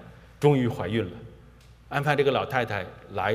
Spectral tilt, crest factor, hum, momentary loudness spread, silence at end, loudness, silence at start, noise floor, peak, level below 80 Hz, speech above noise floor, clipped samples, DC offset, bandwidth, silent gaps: -7 dB/octave; 20 dB; none; 12 LU; 0 s; -26 LUFS; 0 s; -51 dBFS; -6 dBFS; -54 dBFS; 26 dB; under 0.1%; under 0.1%; 15.5 kHz; none